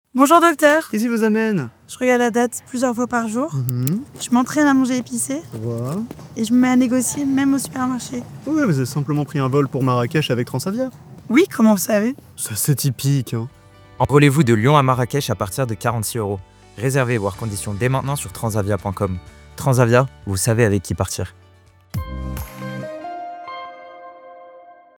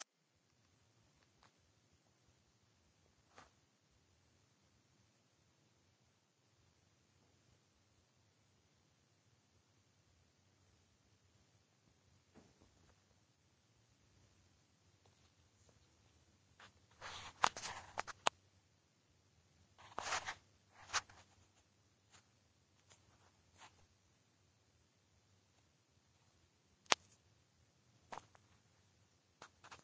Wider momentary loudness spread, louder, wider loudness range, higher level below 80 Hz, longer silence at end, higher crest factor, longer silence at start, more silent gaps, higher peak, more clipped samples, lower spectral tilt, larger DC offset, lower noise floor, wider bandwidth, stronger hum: second, 16 LU vs 26 LU; first, -19 LUFS vs -42 LUFS; about the same, 5 LU vs 6 LU; first, -46 dBFS vs -80 dBFS; first, 0.3 s vs 0.05 s; second, 18 dB vs 46 dB; first, 0.15 s vs 0 s; neither; first, 0 dBFS vs -8 dBFS; neither; first, -5.5 dB/octave vs -0.5 dB/octave; neither; second, -50 dBFS vs -80 dBFS; first, over 20 kHz vs 8 kHz; neither